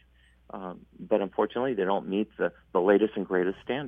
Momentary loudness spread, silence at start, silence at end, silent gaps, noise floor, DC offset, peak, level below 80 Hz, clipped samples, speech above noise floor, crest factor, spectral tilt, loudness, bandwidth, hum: 17 LU; 0.55 s; 0 s; none; -60 dBFS; under 0.1%; -8 dBFS; -62 dBFS; under 0.1%; 33 dB; 20 dB; -8.5 dB/octave; -27 LUFS; 3.8 kHz; none